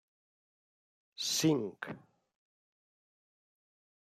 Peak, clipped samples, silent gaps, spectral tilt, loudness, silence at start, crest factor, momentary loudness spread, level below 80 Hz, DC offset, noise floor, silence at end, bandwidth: -18 dBFS; under 0.1%; none; -3.5 dB/octave; -33 LUFS; 1.2 s; 22 dB; 16 LU; -84 dBFS; under 0.1%; under -90 dBFS; 2.05 s; 15 kHz